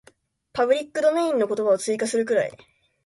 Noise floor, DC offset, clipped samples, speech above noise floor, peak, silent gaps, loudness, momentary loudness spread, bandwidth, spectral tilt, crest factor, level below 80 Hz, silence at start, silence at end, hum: -58 dBFS; under 0.1%; under 0.1%; 36 dB; -8 dBFS; none; -23 LUFS; 4 LU; 11.5 kHz; -3.5 dB/octave; 16 dB; -68 dBFS; 0.55 s; 0.5 s; none